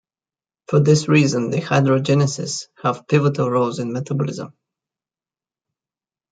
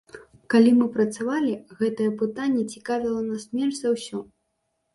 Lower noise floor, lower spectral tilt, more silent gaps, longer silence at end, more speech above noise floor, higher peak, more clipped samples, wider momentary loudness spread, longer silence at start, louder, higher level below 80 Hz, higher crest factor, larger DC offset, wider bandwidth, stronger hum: first, under -90 dBFS vs -75 dBFS; about the same, -6 dB/octave vs -5.5 dB/octave; neither; first, 1.85 s vs 0.7 s; first, over 72 dB vs 52 dB; first, -2 dBFS vs -6 dBFS; neither; about the same, 10 LU vs 10 LU; first, 0.7 s vs 0.15 s; first, -19 LUFS vs -24 LUFS; about the same, -62 dBFS vs -66 dBFS; about the same, 18 dB vs 18 dB; neither; second, 9.2 kHz vs 11.5 kHz; neither